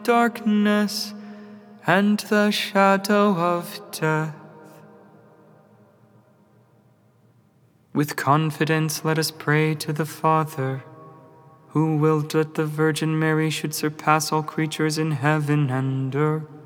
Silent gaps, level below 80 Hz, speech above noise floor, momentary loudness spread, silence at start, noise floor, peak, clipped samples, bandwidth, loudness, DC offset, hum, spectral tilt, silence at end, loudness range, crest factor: none; -84 dBFS; 37 dB; 9 LU; 0 s; -59 dBFS; -4 dBFS; under 0.1%; over 20 kHz; -22 LUFS; under 0.1%; none; -5.5 dB/octave; 0 s; 8 LU; 20 dB